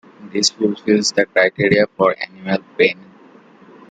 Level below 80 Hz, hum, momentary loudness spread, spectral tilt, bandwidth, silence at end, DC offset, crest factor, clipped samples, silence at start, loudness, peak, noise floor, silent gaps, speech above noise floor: -58 dBFS; none; 9 LU; -3.5 dB/octave; 9.4 kHz; 1 s; under 0.1%; 16 dB; under 0.1%; 0.2 s; -17 LUFS; -2 dBFS; -46 dBFS; none; 29 dB